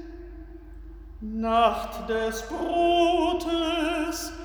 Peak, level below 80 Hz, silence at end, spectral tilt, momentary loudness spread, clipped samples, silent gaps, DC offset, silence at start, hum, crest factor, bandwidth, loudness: -8 dBFS; -44 dBFS; 0 s; -4 dB/octave; 24 LU; under 0.1%; none; under 0.1%; 0 s; none; 18 dB; over 20 kHz; -25 LUFS